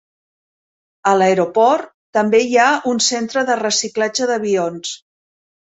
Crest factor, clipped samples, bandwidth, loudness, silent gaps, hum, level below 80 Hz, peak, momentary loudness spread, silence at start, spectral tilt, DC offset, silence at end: 16 dB; under 0.1%; 8.4 kHz; -16 LUFS; 1.94-2.13 s; none; -66 dBFS; -2 dBFS; 8 LU; 1.05 s; -3 dB/octave; under 0.1%; 0.8 s